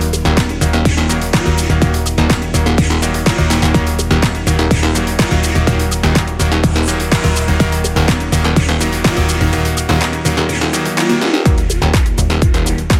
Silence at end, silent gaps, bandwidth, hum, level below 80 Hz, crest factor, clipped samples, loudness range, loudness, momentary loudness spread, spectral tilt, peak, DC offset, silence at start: 0 s; none; 16 kHz; none; -18 dBFS; 12 dB; under 0.1%; 1 LU; -14 LUFS; 2 LU; -5 dB/octave; -2 dBFS; under 0.1%; 0 s